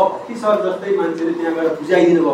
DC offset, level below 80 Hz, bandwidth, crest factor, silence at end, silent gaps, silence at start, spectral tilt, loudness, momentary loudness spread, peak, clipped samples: under 0.1%; -68 dBFS; 10 kHz; 14 dB; 0 s; none; 0 s; -6.5 dB/octave; -17 LUFS; 7 LU; -2 dBFS; under 0.1%